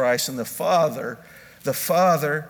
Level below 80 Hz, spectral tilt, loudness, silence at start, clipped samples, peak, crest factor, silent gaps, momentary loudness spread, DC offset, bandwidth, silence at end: -66 dBFS; -4 dB/octave; -22 LUFS; 0 s; under 0.1%; -8 dBFS; 14 dB; none; 13 LU; under 0.1%; over 20 kHz; 0 s